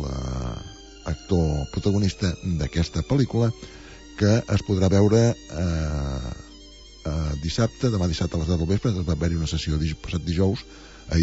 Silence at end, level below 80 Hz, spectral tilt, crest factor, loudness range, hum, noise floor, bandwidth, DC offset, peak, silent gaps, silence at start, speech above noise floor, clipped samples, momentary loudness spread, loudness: 0 s; -34 dBFS; -6.5 dB/octave; 18 dB; 4 LU; none; -45 dBFS; 8 kHz; under 0.1%; -6 dBFS; none; 0 s; 22 dB; under 0.1%; 17 LU; -24 LUFS